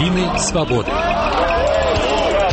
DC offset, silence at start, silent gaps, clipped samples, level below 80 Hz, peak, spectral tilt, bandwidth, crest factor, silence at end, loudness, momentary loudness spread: under 0.1%; 0 s; none; under 0.1%; -28 dBFS; -6 dBFS; -4.5 dB/octave; 8.8 kHz; 12 dB; 0 s; -17 LUFS; 2 LU